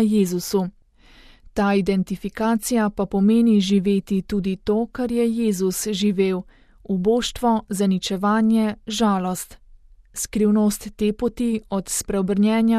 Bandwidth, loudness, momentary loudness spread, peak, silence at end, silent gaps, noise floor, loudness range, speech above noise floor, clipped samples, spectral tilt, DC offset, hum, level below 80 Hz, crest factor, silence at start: 15 kHz; -21 LUFS; 7 LU; -8 dBFS; 0 s; none; -50 dBFS; 3 LU; 30 dB; under 0.1%; -5.5 dB/octave; under 0.1%; none; -46 dBFS; 14 dB; 0 s